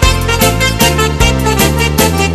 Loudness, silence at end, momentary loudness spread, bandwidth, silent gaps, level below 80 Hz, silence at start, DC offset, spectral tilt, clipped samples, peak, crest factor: -10 LUFS; 0 s; 1 LU; 15.5 kHz; none; -18 dBFS; 0 s; under 0.1%; -4 dB/octave; 0.3%; 0 dBFS; 10 dB